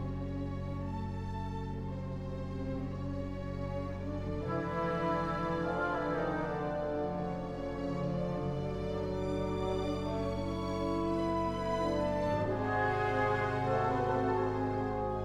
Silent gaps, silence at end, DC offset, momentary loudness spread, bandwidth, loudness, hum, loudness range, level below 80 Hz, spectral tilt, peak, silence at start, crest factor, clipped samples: none; 0 s; under 0.1%; 8 LU; 11.5 kHz; -35 LUFS; none; 7 LU; -48 dBFS; -7.5 dB/octave; -20 dBFS; 0 s; 14 dB; under 0.1%